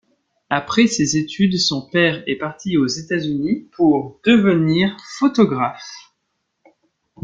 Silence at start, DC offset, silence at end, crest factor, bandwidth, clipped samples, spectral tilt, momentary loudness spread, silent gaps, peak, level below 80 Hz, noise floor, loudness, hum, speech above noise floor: 0.5 s; under 0.1%; 1.25 s; 18 dB; 9.4 kHz; under 0.1%; -5 dB/octave; 8 LU; none; -2 dBFS; -56 dBFS; -73 dBFS; -18 LUFS; none; 55 dB